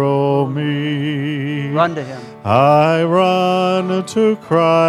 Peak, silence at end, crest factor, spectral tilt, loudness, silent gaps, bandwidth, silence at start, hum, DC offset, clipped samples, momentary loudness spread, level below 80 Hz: 0 dBFS; 0 s; 14 dB; -7 dB/octave; -16 LUFS; none; 13 kHz; 0 s; none; under 0.1%; under 0.1%; 8 LU; -64 dBFS